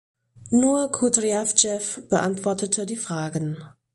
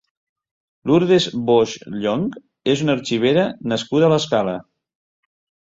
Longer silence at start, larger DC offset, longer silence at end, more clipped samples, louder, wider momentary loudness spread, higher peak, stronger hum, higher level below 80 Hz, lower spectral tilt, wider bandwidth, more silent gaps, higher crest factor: second, 0.4 s vs 0.85 s; neither; second, 0.25 s vs 1.05 s; neither; second, -22 LUFS vs -19 LUFS; about the same, 9 LU vs 10 LU; about the same, -2 dBFS vs -4 dBFS; neither; about the same, -60 dBFS vs -58 dBFS; second, -3.5 dB/octave vs -5.5 dB/octave; first, 11.5 kHz vs 7.8 kHz; neither; first, 22 dB vs 16 dB